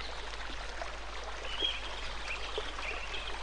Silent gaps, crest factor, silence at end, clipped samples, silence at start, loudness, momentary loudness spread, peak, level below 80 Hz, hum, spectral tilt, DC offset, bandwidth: none; 20 dB; 0 s; under 0.1%; 0 s; -38 LUFS; 8 LU; -20 dBFS; -46 dBFS; none; -2.5 dB/octave; 0.7%; 10 kHz